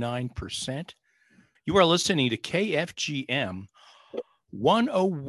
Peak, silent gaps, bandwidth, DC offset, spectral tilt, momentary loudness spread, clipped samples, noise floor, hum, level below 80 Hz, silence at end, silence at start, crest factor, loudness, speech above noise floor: -6 dBFS; none; 12.5 kHz; under 0.1%; -4.5 dB/octave; 18 LU; under 0.1%; -62 dBFS; none; -54 dBFS; 0 s; 0 s; 20 dB; -26 LUFS; 36 dB